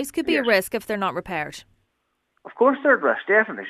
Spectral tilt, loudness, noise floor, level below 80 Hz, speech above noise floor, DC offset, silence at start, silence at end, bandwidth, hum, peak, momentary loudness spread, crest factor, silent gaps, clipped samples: -4 dB/octave; -21 LUFS; -74 dBFS; -60 dBFS; 52 dB; under 0.1%; 0 s; 0 s; 14 kHz; none; -4 dBFS; 10 LU; 18 dB; none; under 0.1%